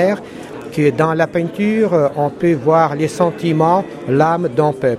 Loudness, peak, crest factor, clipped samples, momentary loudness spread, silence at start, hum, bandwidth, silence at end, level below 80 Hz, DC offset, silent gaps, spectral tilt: -16 LUFS; 0 dBFS; 16 dB; under 0.1%; 5 LU; 0 s; none; 13 kHz; 0 s; -54 dBFS; under 0.1%; none; -7.5 dB/octave